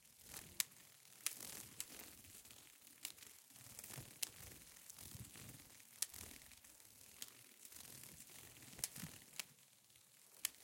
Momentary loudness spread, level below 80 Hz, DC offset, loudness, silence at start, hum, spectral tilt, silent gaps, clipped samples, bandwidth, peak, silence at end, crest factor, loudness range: 15 LU; -78 dBFS; under 0.1%; -51 LUFS; 0 s; none; -1 dB/octave; none; under 0.1%; 17 kHz; -12 dBFS; 0 s; 42 dB; 4 LU